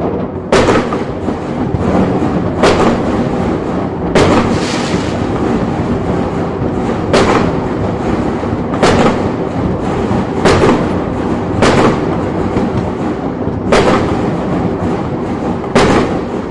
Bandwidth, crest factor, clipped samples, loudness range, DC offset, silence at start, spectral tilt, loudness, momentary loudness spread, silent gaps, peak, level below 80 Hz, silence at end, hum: 11.5 kHz; 12 dB; under 0.1%; 2 LU; under 0.1%; 0 s; -6.5 dB/octave; -13 LUFS; 7 LU; none; 0 dBFS; -30 dBFS; 0 s; none